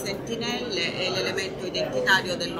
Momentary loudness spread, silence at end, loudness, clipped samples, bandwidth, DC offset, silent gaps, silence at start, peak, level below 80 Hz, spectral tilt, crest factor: 8 LU; 0 s; -25 LUFS; under 0.1%; 16 kHz; under 0.1%; none; 0 s; -6 dBFS; -54 dBFS; -3 dB/octave; 22 dB